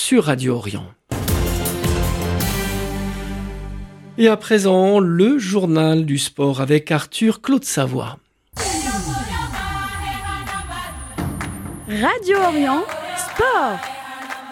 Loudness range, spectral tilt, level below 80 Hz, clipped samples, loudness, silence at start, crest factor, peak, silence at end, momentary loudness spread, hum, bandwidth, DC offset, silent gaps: 8 LU; -5 dB/octave; -34 dBFS; under 0.1%; -19 LUFS; 0 s; 18 dB; -2 dBFS; 0 s; 14 LU; none; 17 kHz; under 0.1%; none